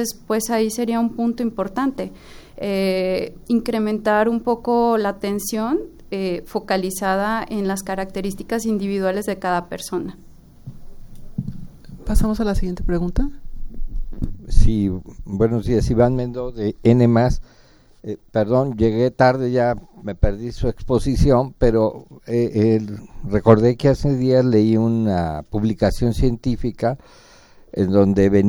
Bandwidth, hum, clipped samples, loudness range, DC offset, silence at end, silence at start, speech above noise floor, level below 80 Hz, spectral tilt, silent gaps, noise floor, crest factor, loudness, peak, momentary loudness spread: over 20 kHz; none; under 0.1%; 8 LU; under 0.1%; 0 s; 0 s; 21 dB; -28 dBFS; -7 dB/octave; none; -39 dBFS; 20 dB; -20 LUFS; 0 dBFS; 15 LU